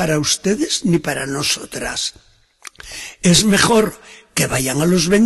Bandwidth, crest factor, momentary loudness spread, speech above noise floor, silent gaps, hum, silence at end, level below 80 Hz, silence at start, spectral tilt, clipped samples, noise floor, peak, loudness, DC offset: 12.5 kHz; 16 dB; 12 LU; 25 dB; none; none; 0 s; -44 dBFS; 0 s; -3.5 dB/octave; under 0.1%; -42 dBFS; 0 dBFS; -16 LUFS; under 0.1%